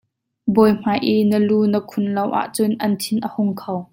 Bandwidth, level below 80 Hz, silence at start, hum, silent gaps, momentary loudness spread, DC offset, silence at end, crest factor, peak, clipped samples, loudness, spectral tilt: 16.5 kHz; -58 dBFS; 0.45 s; none; none; 7 LU; under 0.1%; 0.1 s; 16 dB; -2 dBFS; under 0.1%; -19 LUFS; -6 dB/octave